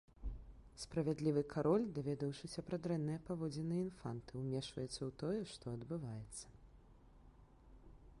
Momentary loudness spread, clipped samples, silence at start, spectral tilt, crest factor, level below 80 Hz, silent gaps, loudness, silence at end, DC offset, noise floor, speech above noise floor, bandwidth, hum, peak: 15 LU; under 0.1%; 0.2 s; -6.5 dB/octave; 18 dB; -60 dBFS; none; -42 LUFS; 0 s; under 0.1%; -63 dBFS; 22 dB; 11.5 kHz; none; -24 dBFS